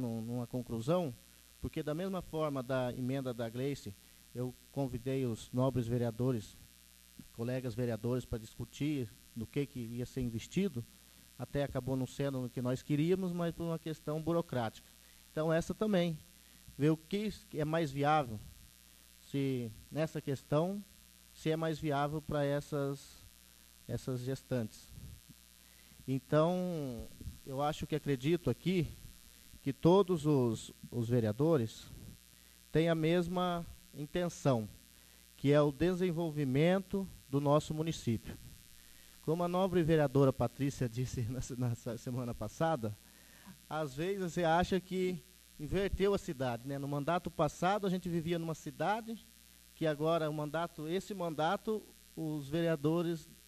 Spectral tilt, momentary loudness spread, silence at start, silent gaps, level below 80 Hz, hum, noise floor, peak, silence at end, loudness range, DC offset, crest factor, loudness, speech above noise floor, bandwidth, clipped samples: -6.5 dB/octave; 15 LU; 0 s; none; -58 dBFS; none; -61 dBFS; -14 dBFS; 0.15 s; 6 LU; under 0.1%; 22 dB; -36 LUFS; 26 dB; 14 kHz; under 0.1%